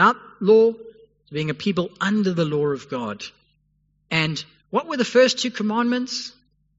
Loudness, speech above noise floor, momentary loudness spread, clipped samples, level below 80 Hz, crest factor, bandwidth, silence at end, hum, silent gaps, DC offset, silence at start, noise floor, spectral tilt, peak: -22 LUFS; 45 dB; 15 LU; under 0.1%; -64 dBFS; 18 dB; 8 kHz; 0.5 s; 50 Hz at -55 dBFS; none; under 0.1%; 0 s; -66 dBFS; -4 dB/octave; -4 dBFS